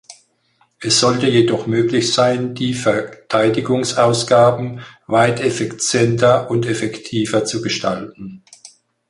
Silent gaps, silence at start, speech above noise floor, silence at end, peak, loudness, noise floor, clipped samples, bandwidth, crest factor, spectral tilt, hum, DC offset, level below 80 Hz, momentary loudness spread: none; 0.1 s; 44 dB; 0.45 s; -2 dBFS; -16 LUFS; -60 dBFS; under 0.1%; 11.5 kHz; 16 dB; -4.5 dB/octave; none; under 0.1%; -54 dBFS; 10 LU